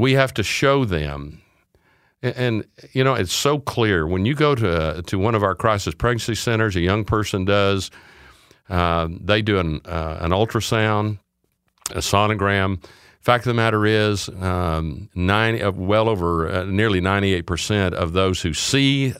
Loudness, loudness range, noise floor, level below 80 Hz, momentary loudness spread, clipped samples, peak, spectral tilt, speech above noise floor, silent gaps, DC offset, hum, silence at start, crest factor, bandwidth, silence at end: -20 LUFS; 2 LU; -70 dBFS; -40 dBFS; 8 LU; under 0.1%; 0 dBFS; -5 dB/octave; 50 dB; none; under 0.1%; none; 0 s; 20 dB; 16 kHz; 0 s